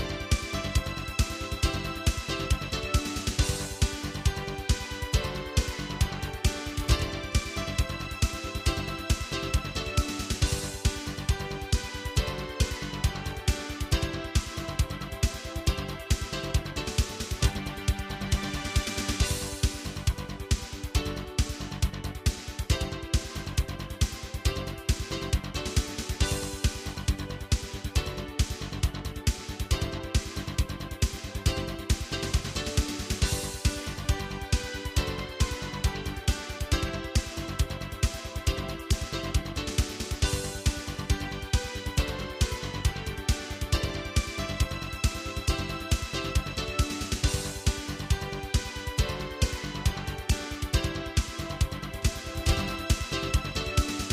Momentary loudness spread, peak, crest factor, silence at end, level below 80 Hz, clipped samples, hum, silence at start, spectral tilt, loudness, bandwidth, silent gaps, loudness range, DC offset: 3 LU; -10 dBFS; 20 dB; 0 s; -32 dBFS; under 0.1%; none; 0 s; -4 dB/octave; -31 LUFS; 15.5 kHz; none; 2 LU; under 0.1%